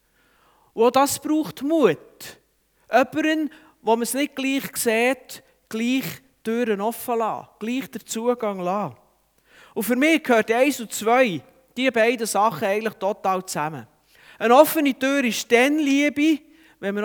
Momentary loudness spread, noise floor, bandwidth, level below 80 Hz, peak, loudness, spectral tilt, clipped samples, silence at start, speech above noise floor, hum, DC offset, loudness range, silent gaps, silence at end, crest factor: 14 LU; -61 dBFS; over 20 kHz; -70 dBFS; -2 dBFS; -22 LUFS; -3.5 dB/octave; under 0.1%; 0.75 s; 40 dB; none; under 0.1%; 6 LU; none; 0 s; 22 dB